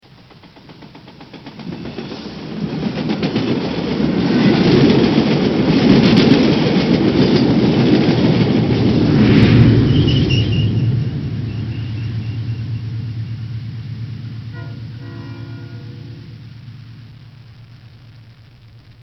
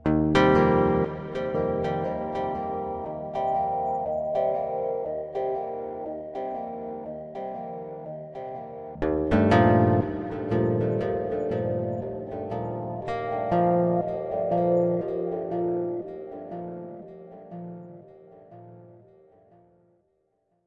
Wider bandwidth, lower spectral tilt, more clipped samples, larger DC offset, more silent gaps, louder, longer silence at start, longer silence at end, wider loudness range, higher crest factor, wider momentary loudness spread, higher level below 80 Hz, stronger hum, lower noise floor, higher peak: second, 6.2 kHz vs 8.2 kHz; about the same, -8 dB/octave vs -8.5 dB/octave; neither; neither; neither; first, -15 LUFS vs -27 LUFS; first, 0.45 s vs 0.05 s; second, 0.9 s vs 1.7 s; first, 19 LU vs 13 LU; about the same, 16 dB vs 20 dB; first, 20 LU vs 17 LU; first, -36 dBFS vs -50 dBFS; neither; second, -43 dBFS vs -72 dBFS; first, 0 dBFS vs -6 dBFS